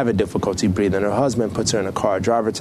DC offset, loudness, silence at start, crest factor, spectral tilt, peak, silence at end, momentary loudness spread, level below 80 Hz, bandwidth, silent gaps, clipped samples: under 0.1%; -20 LUFS; 0 s; 16 dB; -5.5 dB/octave; -4 dBFS; 0 s; 2 LU; -44 dBFS; 13.5 kHz; none; under 0.1%